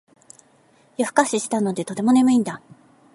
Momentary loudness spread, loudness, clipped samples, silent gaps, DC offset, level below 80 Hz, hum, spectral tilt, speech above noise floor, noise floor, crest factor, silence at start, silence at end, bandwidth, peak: 14 LU; -20 LUFS; under 0.1%; none; under 0.1%; -72 dBFS; none; -4.5 dB/octave; 37 dB; -57 dBFS; 20 dB; 1 s; 0.6 s; 11.5 kHz; -2 dBFS